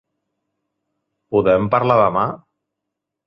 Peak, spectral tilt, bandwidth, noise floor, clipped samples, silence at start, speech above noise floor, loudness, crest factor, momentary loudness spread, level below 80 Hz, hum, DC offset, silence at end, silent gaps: -2 dBFS; -9.5 dB/octave; 5.8 kHz; -81 dBFS; under 0.1%; 1.3 s; 65 dB; -17 LUFS; 20 dB; 9 LU; -52 dBFS; none; under 0.1%; 0.9 s; none